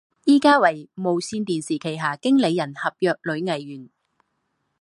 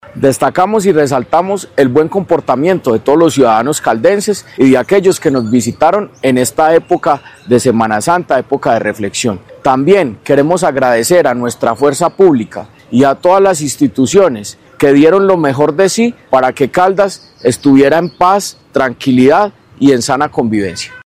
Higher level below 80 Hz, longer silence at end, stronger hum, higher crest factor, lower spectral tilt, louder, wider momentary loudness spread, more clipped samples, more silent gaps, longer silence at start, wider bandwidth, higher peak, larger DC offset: second, -70 dBFS vs -48 dBFS; first, 0.95 s vs 0.05 s; neither; first, 20 dB vs 10 dB; about the same, -5 dB/octave vs -5 dB/octave; second, -21 LUFS vs -11 LUFS; first, 11 LU vs 7 LU; second, under 0.1% vs 2%; neither; about the same, 0.25 s vs 0.15 s; second, 11.5 kHz vs 16 kHz; about the same, -2 dBFS vs 0 dBFS; second, under 0.1% vs 0.2%